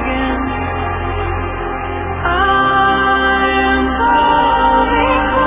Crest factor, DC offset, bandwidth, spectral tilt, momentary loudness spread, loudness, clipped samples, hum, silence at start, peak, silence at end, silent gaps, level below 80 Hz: 12 dB; under 0.1%; 3.8 kHz; -9 dB/octave; 9 LU; -14 LUFS; under 0.1%; none; 0 s; -2 dBFS; 0 s; none; -26 dBFS